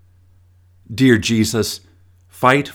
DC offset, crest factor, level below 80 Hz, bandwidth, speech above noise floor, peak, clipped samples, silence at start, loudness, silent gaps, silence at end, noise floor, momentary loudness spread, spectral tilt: under 0.1%; 18 dB; -50 dBFS; 19.5 kHz; 36 dB; 0 dBFS; under 0.1%; 0.9 s; -16 LUFS; none; 0 s; -51 dBFS; 14 LU; -5 dB/octave